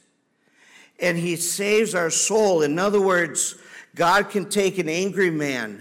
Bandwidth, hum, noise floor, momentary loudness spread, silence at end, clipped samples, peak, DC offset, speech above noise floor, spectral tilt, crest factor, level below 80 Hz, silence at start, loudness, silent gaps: 17 kHz; none; -65 dBFS; 7 LU; 0 s; under 0.1%; -10 dBFS; under 0.1%; 44 dB; -3.5 dB/octave; 12 dB; -64 dBFS; 1 s; -21 LUFS; none